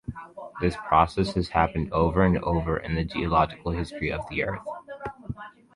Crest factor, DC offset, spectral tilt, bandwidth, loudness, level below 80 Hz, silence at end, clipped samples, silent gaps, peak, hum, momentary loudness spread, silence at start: 22 dB; under 0.1%; -7.5 dB/octave; 11 kHz; -25 LUFS; -38 dBFS; 0.25 s; under 0.1%; none; -4 dBFS; none; 17 LU; 0.1 s